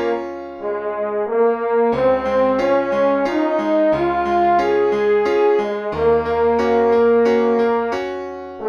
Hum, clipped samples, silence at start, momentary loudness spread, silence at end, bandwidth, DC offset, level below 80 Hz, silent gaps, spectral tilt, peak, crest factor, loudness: none; under 0.1%; 0 s; 9 LU; 0 s; 6.8 kHz; under 0.1%; -46 dBFS; none; -6.5 dB/octave; -6 dBFS; 12 dB; -17 LUFS